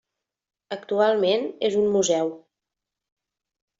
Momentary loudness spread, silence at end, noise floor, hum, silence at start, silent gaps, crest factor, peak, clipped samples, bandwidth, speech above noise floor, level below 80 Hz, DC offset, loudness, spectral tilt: 11 LU; 1.4 s; -88 dBFS; none; 0.7 s; none; 18 dB; -8 dBFS; under 0.1%; 7.8 kHz; 66 dB; -68 dBFS; under 0.1%; -23 LUFS; -3.5 dB/octave